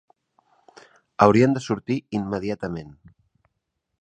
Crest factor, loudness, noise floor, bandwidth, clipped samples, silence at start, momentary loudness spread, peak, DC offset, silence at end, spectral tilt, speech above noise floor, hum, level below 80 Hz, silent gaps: 24 dB; -22 LUFS; -78 dBFS; 9.4 kHz; under 0.1%; 1.2 s; 16 LU; 0 dBFS; under 0.1%; 1.1 s; -7 dB/octave; 57 dB; none; -56 dBFS; none